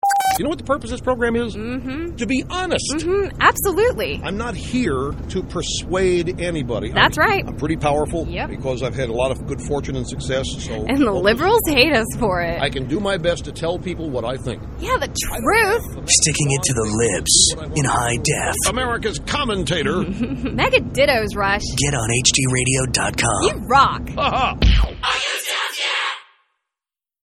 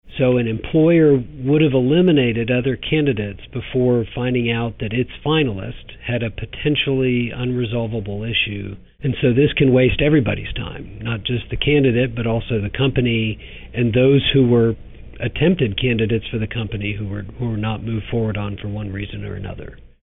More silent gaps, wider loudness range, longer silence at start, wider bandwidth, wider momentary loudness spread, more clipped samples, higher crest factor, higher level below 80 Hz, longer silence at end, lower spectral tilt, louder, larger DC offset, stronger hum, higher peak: neither; about the same, 5 LU vs 5 LU; about the same, 0.05 s vs 0.05 s; first, 14.5 kHz vs 4 kHz; second, 10 LU vs 14 LU; neither; first, 20 dB vs 12 dB; first, -30 dBFS vs -36 dBFS; first, 1 s vs 0.15 s; second, -3.5 dB/octave vs -5.5 dB/octave; about the same, -19 LUFS vs -19 LUFS; neither; neither; first, 0 dBFS vs -6 dBFS